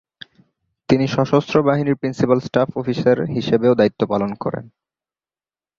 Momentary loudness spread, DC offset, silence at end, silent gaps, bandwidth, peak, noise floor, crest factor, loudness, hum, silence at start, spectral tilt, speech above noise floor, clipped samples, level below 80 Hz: 6 LU; under 0.1%; 1.1 s; none; 7.4 kHz; -2 dBFS; under -90 dBFS; 18 dB; -18 LUFS; none; 0.9 s; -7.5 dB/octave; over 72 dB; under 0.1%; -54 dBFS